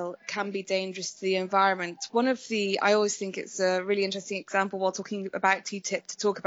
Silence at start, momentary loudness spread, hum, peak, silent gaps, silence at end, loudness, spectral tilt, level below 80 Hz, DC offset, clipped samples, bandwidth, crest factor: 0 s; 9 LU; none; -10 dBFS; none; 0.05 s; -28 LUFS; -3.5 dB/octave; -84 dBFS; under 0.1%; under 0.1%; 8 kHz; 18 dB